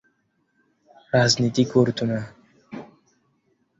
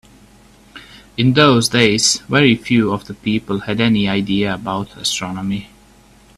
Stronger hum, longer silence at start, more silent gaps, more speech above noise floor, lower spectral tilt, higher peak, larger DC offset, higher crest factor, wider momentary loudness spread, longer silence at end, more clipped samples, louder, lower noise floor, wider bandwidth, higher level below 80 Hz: neither; first, 1.15 s vs 0.75 s; neither; first, 49 dB vs 31 dB; about the same, -5 dB/octave vs -4 dB/octave; second, -4 dBFS vs 0 dBFS; neither; about the same, 20 dB vs 18 dB; first, 21 LU vs 11 LU; first, 0.95 s vs 0.7 s; neither; second, -21 LUFS vs -16 LUFS; first, -69 dBFS vs -47 dBFS; second, 8 kHz vs 13.5 kHz; second, -60 dBFS vs -48 dBFS